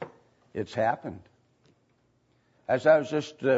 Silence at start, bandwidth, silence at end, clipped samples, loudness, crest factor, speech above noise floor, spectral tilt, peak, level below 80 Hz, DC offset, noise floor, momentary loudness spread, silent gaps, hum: 0 s; 8 kHz; 0 s; under 0.1%; -27 LUFS; 20 dB; 43 dB; -6 dB/octave; -8 dBFS; -70 dBFS; under 0.1%; -69 dBFS; 21 LU; none; none